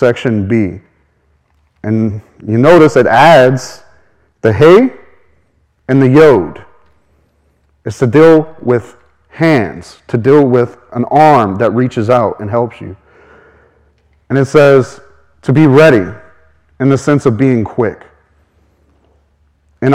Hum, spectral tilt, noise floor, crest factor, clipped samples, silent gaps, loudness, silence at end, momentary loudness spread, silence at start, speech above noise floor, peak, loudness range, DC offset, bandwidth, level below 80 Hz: none; -7.5 dB/octave; -55 dBFS; 12 dB; 2%; none; -10 LUFS; 0 s; 16 LU; 0 s; 47 dB; 0 dBFS; 5 LU; under 0.1%; 13 kHz; -46 dBFS